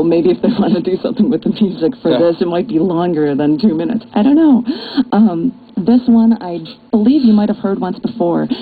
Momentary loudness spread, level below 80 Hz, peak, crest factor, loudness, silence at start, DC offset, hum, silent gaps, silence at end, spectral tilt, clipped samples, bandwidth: 8 LU; -50 dBFS; -2 dBFS; 12 dB; -14 LUFS; 0 s; under 0.1%; none; none; 0 s; -10.5 dB/octave; under 0.1%; 4.8 kHz